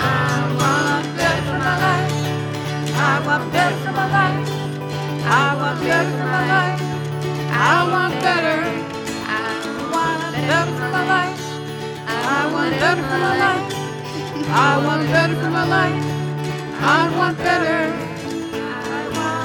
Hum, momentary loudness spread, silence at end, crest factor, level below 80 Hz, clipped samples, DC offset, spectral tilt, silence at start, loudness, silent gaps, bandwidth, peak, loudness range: none; 9 LU; 0 s; 14 dB; -52 dBFS; under 0.1%; under 0.1%; -5 dB/octave; 0 s; -19 LUFS; none; 18 kHz; -4 dBFS; 2 LU